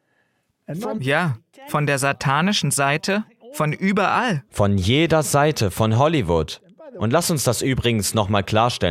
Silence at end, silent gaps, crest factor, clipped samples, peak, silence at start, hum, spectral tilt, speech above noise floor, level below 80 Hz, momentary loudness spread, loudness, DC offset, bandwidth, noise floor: 0 s; none; 18 dB; under 0.1%; -2 dBFS; 0.7 s; none; -4.5 dB/octave; 48 dB; -44 dBFS; 9 LU; -20 LUFS; under 0.1%; 16 kHz; -67 dBFS